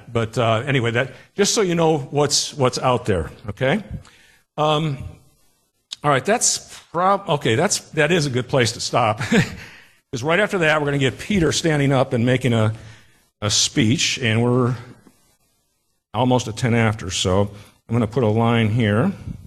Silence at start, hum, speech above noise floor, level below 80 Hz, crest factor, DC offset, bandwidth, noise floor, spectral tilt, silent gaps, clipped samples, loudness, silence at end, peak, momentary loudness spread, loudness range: 0.05 s; none; 50 dB; -46 dBFS; 16 dB; under 0.1%; 13 kHz; -69 dBFS; -4.5 dB/octave; none; under 0.1%; -19 LUFS; 0 s; -4 dBFS; 9 LU; 3 LU